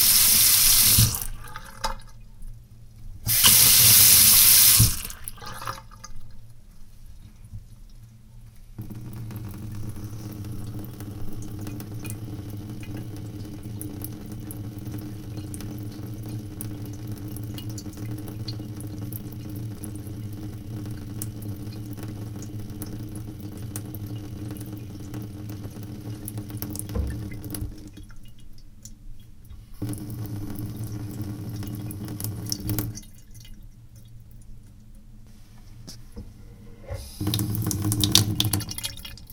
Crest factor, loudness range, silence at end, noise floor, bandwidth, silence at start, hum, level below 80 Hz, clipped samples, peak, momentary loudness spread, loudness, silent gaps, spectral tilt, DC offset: 26 dB; 23 LU; 0 s; -46 dBFS; 19 kHz; 0 s; none; -42 dBFS; under 0.1%; 0 dBFS; 23 LU; -18 LUFS; none; -2 dB/octave; under 0.1%